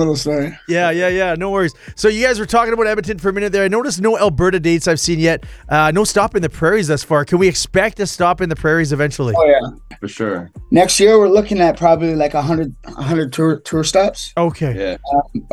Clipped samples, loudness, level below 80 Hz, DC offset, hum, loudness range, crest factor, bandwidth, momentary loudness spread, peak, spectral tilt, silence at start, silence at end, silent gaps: under 0.1%; -15 LUFS; -38 dBFS; under 0.1%; none; 3 LU; 14 dB; 14.5 kHz; 8 LU; 0 dBFS; -5 dB/octave; 0 s; 0.05 s; none